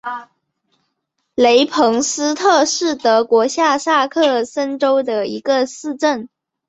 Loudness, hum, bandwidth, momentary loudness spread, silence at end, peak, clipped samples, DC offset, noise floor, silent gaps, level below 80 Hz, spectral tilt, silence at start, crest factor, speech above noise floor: -16 LUFS; none; 8.4 kHz; 8 LU; 0.4 s; -2 dBFS; under 0.1%; under 0.1%; -72 dBFS; none; -62 dBFS; -2 dB/octave; 0.05 s; 16 dB; 57 dB